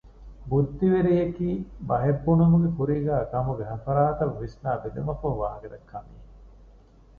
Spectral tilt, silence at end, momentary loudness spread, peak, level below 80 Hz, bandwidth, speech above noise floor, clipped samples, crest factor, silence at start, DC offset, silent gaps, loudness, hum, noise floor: -11.5 dB/octave; 0.7 s; 14 LU; -10 dBFS; -44 dBFS; 4.8 kHz; 28 dB; under 0.1%; 16 dB; 0.05 s; under 0.1%; none; -25 LUFS; none; -52 dBFS